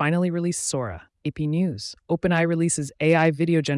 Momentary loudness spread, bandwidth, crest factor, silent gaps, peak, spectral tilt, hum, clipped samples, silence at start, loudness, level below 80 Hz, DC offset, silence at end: 12 LU; 12 kHz; 14 dB; none; -8 dBFS; -5.5 dB/octave; none; under 0.1%; 0 s; -23 LUFS; -56 dBFS; under 0.1%; 0 s